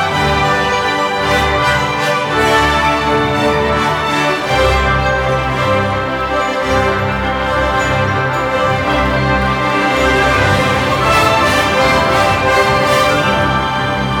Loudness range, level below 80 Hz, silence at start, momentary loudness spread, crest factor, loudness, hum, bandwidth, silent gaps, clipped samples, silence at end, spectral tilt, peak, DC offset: 3 LU; -28 dBFS; 0 s; 4 LU; 12 dB; -13 LUFS; none; 19.5 kHz; none; under 0.1%; 0 s; -4.5 dB/octave; 0 dBFS; under 0.1%